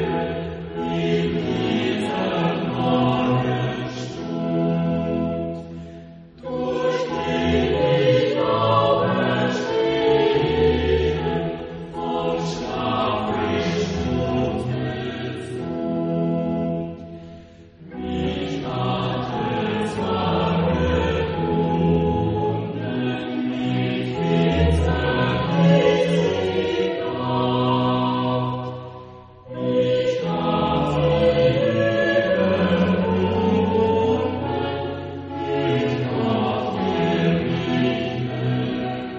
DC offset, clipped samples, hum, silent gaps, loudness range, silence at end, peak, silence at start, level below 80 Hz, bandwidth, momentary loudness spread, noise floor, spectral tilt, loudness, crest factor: under 0.1%; under 0.1%; none; none; 6 LU; 0 s; -6 dBFS; 0 s; -40 dBFS; 8.4 kHz; 10 LU; -43 dBFS; -7.5 dB/octave; -22 LUFS; 16 dB